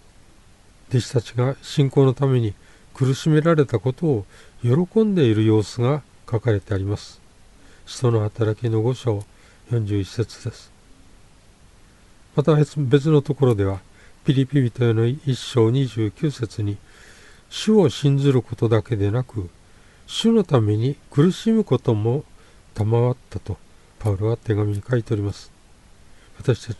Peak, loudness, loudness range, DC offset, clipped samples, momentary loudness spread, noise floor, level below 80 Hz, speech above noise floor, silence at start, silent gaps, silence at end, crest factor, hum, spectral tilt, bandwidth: -4 dBFS; -21 LUFS; 5 LU; under 0.1%; under 0.1%; 11 LU; -50 dBFS; -50 dBFS; 30 dB; 0.9 s; none; 0.05 s; 18 dB; none; -7.5 dB/octave; 11.5 kHz